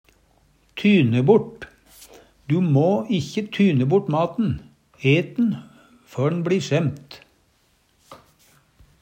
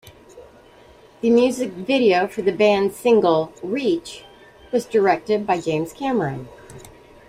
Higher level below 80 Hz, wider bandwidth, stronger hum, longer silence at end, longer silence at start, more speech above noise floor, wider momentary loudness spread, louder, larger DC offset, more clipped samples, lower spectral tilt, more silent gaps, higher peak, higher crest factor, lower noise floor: about the same, -56 dBFS vs -56 dBFS; second, 12 kHz vs 15.5 kHz; neither; first, 0.85 s vs 0.4 s; first, 0.75 s vs 0.35 s; first, 43 dB vs 29 dB; first, 18 LU vs 10 LU; about the same, -21 LUFS vs -20 LUFS; neither; neither; first, -7.5 dB/octave vs -5.5 dB/octave; neither; about the same, -4 dBFS vs -4 dBFS; about the same, 18 dB vs 16 dB; first, -63 dBFS vs -48 dBFS